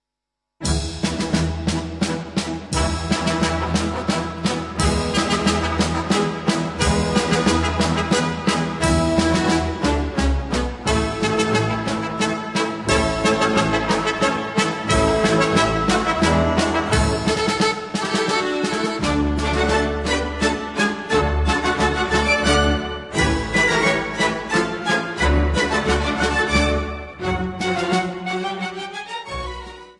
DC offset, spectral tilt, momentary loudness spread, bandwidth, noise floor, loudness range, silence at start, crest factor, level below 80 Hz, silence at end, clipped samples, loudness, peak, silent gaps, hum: under 0.1%; -4.5 dB/octave; 7 LU; 11.5 kHz; -82 dBFS; 4 LU; 0.6 s; 16 dB; -32 dBFS; 0.1 s; under 0.1%; -20 LUFS; -4 dBFS; none; none